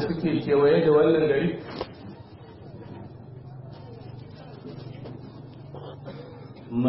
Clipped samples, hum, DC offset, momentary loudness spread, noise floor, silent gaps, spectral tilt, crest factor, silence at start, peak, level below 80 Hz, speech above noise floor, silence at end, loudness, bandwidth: under 0.1%; none; under 0.1%; 24 LU; -45 dBFS; none; -11.5 dB/octave; 18 dB; 0 s; -10 dBFS; -58 dBFS; 24 dB; 0 s; -22 LUFS; 5.8 kHz